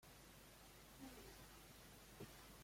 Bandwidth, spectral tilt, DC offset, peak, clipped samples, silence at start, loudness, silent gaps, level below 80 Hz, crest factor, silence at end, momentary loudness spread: 16.5 kHz; -3.5 dB/octave; under 0.1%; -44 dBFS; under 0.1%; 0 s; -61 LUFS; none; -70 dBFS; 18 dB; 0 s; 4 LU